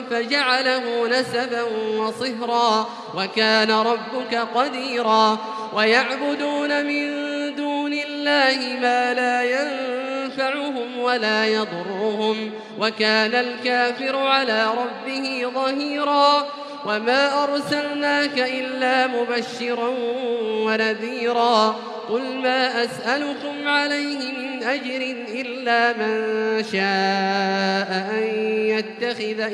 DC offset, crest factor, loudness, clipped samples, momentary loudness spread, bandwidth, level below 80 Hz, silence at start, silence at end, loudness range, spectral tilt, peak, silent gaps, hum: under 0.1%; 20 dB; -21 LUFS; under 0.1%; 8 LU; 12 kHz; -76 dBFS; 0 s; 0 s; 2 LU; -4 dB/octave; -2 dBFS; none; none